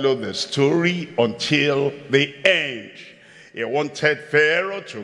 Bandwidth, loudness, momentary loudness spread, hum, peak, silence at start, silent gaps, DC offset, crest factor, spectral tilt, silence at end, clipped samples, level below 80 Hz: 11.5 kHz; -20 LUFS; 10 LU; none; 0 dBFS; 0 s; none; under 0.1%; 20 dB; -4.5 dB/octave; 0 s; under 0.1%; -70 dBFS